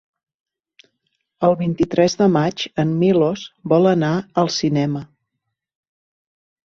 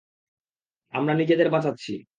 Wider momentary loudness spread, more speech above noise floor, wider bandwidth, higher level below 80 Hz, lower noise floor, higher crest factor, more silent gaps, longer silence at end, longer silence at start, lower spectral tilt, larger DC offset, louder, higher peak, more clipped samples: second, 6 LU vs 12 LU; about the same, 61 dB vs 63 dB; second, 7.4 kHz vs 9 kHz; first, -54 dBFS vs -72 dBFS; second, -78 dBFS vs -86 dBFS; about the same, 18 dB vs 18 dB; neither; first, 1.6 s vs 0.15 s; first, 1.4 s vs 0.95 s; about the same, -6.5 dB/octave vs -7.5 dB/octave; neither; first, -18 LUFS vs -23 LUFS; first, -2 dBFS vs -8 dBFS; neither